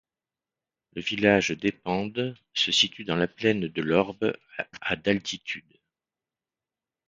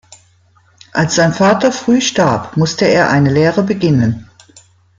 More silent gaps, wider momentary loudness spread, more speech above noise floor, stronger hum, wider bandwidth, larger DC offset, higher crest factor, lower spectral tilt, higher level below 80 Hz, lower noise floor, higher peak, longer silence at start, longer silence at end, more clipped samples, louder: neither; first, 12 LU vs 6 LU; first, over 63 dB vs 39 dB; neither; about the same, 9.2 kHz vs 9.2 kHz; neither; first, 24 dB vs 14 dB; second, -4 dB/octave vs -5.5 dB/octave; second, -60 dBFS vs -48 dBFS; first, under -90 dBFS vs -51 dBFS; second, -4 dBFS vs 0 dBFS; about the same, 0.95 s vs 0.95 s; first, 1.5 s vs 0.75 s; neither; second, -26 LUFS vs -13 LUFS